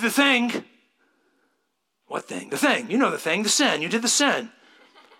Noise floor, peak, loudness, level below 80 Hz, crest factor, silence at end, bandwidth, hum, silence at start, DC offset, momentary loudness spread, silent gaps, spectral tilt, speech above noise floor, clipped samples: -75 dBFS; -4 dBFS; -21 LUFS; -78 dBFS; 20 dB; 0.7 s; 17 kHz; none; 0 s; under 0.1%; 14 LU; none; -2 dB/octave; 53 dB; under 0.1%